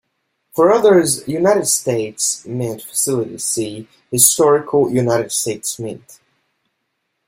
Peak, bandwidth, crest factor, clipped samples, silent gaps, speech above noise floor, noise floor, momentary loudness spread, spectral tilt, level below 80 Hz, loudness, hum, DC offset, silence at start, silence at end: 0 dBFS; 16.5 kHz; 18 dB; under 0.1%; none; 56 dB; -72 dBFS; 13 LU; -3.5 dB/octave; -58 dBFS; -16 LUFS; none; under 0.1%; 0.55 s; 1.15 s